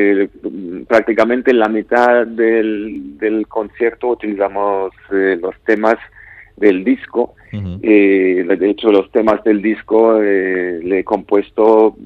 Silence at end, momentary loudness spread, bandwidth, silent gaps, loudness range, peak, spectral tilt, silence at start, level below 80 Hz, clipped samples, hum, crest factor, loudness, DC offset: 0 s; 9 LU; 7.2 kHz; none; 4 LU; 0 dBFS; -7.5 dB/octave; 0 s; -52 dBFS; under 0.1%; none; 14 dB; -14 LUFS; under 0.1%